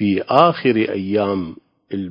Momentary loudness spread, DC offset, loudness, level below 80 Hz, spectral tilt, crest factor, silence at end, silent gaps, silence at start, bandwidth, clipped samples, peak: 15 LU; under 0.1%; -17 LUFS; -52 dBFS; -8.5 dB/octave; 18 dB; 0 s; none; 0 s; 6.2 kHz; under 0.1%; 0 dBFS